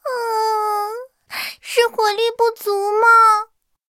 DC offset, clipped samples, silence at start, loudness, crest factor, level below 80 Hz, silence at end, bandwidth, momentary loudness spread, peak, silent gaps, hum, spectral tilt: under 0.1%; under 0.1%; 0.05 s; -17 LUFS; 16 dB; -70 dBFS; 0.45 s; 16.5 kHz; 16 LU; -2 dBFS; none; none; 0 dB/octave